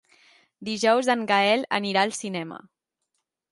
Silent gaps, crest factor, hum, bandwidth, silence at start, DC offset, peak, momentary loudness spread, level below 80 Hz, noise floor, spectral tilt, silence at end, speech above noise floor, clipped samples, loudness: none; 20 dB; none; 11.5 kHz; 0.6 s; under 0.1%; -6 dBFS; 16 LU; -74 dBFS; -79 dBFS; -3.5 dB/octave; 0.95 s; 56 dB; under 0.1%; -23 LUFS